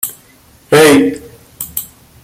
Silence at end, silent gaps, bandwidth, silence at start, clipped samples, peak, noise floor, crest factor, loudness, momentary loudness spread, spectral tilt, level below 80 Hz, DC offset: 0.4 s; none; 16.5 kHz; 0.05 s; under 0.1%; 0 dBFS; -45 dBFS; 14 dB; -11 LUFS; 21 LU; -4 dB/octave; -48 dBFS; under 0.1%